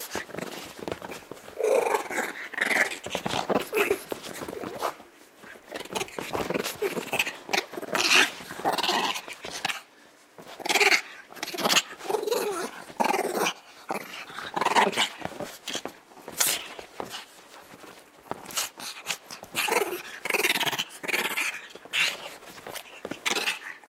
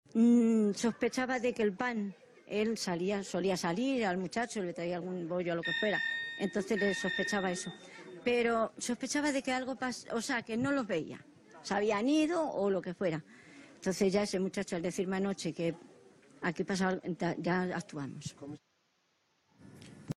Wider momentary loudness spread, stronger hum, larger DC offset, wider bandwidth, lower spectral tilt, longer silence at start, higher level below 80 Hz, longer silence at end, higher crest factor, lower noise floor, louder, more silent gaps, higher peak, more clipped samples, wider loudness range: first, 18 LU vs 12 LU; neither; neither; first, 18 kHz vs 13 kHz; second, -1.5 dB/octave vs -5 dB/octave; second, 0 s vs 0.15 s; about the same, -68 dBFS vs -70 dBFS; about the same, 0.1 s vs 0.05 s; first, 24 dB vs 16 dB; second, -55 dBFS vs -76 dBFS; first, -27 LUFS vs -33 LUFS; neither; first, -6 dBFS vs -18 dBFS; neither; first, 6 LU vs 3 LU